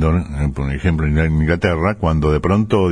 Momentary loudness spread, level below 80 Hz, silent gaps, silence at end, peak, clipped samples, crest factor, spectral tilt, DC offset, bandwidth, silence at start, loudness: 5 LU; -24 dBFS; none; 0 s; -2 dBFS; under 0.1%; 14 dB; -8 dB/octave; under 0.1%; 10 kHz; 0 s; -17 LUFS